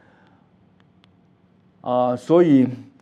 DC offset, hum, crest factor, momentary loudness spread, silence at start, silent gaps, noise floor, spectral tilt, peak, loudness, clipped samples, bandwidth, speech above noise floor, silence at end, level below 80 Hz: under 0.1%; none; 18 dB; 10 LU; 1.85 s; none; -57 dBFS; -8.5 dB/octave; -4 dBFS; -18 LUFS; under 0.1%; 8.8 kHz; 40 dB; 0.2 s; -74 dBFS